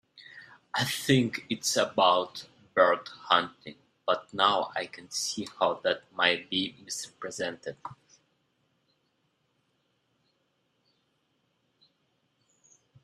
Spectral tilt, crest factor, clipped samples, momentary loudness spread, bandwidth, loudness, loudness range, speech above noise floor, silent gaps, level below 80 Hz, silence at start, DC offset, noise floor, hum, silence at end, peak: -3 dB/octave; 24 dB; under 0.1%; 18 LU; 15.5 kHz; -28 LUFS; 14 LU; 46 dB; none; -72 dBFS; 0.15 s; under 0.1%; -75 dBFS; none; 5.1 s; -6 dBFS